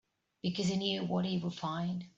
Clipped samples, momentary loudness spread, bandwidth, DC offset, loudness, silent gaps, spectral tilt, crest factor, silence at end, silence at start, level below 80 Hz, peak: under 0.1%; 5 LU; 8 kHz; under 0.1%; -35 LUFS; none; -5.5 dB/octave; 18 dB; 0.1 s; 0.45 s; -70 dBFS; -16 dBFS